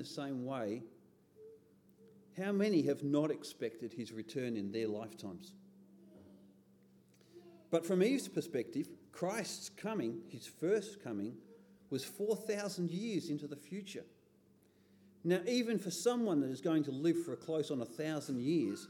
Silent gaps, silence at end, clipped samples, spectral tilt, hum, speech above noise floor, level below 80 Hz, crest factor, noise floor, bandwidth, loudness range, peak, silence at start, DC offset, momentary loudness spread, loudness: none; 0 s; under 0.1%; -5.5 dB/octave; none; 31 dB; -88 dBFS; 20 dB; -68 dBFS; 19 kHz; 7 LU; -20 dBFS; 0 s; under 0.1%; 13 LU; -38 LUFS